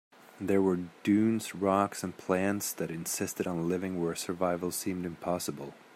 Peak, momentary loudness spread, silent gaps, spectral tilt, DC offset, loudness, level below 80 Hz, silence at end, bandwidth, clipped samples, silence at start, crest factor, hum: -12 dBFS; 8 LU; none; -5 dB/octave; under 0.1%; -31 LUFS; -72 dBFS; 0.2 s; 16 kHz; under 0.1%; 0.35 s; 20 dB; none